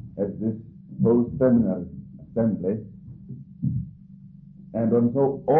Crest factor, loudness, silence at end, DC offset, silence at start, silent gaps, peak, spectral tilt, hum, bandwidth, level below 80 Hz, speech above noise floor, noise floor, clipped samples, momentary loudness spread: 14 dB; -24 LUFS; 0 s; under 0.1%; 0 s; none; -10 dBFS; -14 dB/octave; none; 2.5 kHz; -50 dBFS; 24 dB; -46 dBFS; under 0.1%; 21 LU